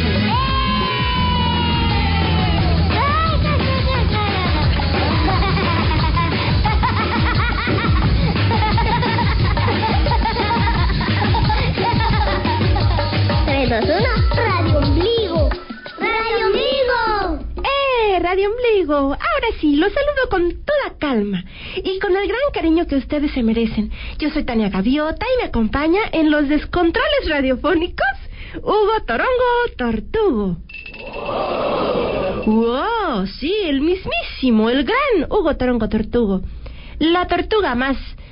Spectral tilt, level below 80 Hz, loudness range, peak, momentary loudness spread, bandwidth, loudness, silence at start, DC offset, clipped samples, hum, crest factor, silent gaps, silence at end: -11 dB/octave; -26 dBFS; 2 LU; -6 dBFS; 5 LU; 5.4 kHz; -18 LUFS; 0 s; under 0.1%; under 0.1%; none; 10 dB; none; 0 s